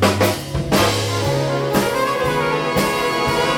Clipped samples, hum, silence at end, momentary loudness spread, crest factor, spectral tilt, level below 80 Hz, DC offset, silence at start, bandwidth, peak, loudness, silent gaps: under 0.1%; none; 0 s; 3 LU; 18 dB; -4.5 dB/octave; -38 dBFS; under 0.1%; 0 s; 17.5 kHz; 0 dBFS; -18 LUFS; none